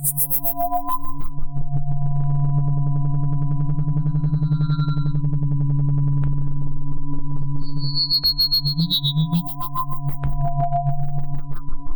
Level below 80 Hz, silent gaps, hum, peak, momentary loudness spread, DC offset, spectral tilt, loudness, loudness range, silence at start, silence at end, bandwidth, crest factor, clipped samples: -28 dBFS; none; none; -8 dBFS; 12 LU; under 0.1%; -6 dB/octave; -22 LUFS; 3 LU; 0 s; 0 s; over 20 kHz; 10 dB; under 0.1%